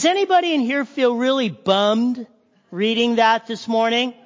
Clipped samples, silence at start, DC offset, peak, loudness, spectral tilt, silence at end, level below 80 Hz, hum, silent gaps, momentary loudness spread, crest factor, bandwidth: under 0.1%; 0 s; under 0.1%; -4 dBFS; -19 LUFS; -4 dB/octave; 0.15 s; -68 dBFS; none; none; 7 LU; 14 dB; 7.6 kHz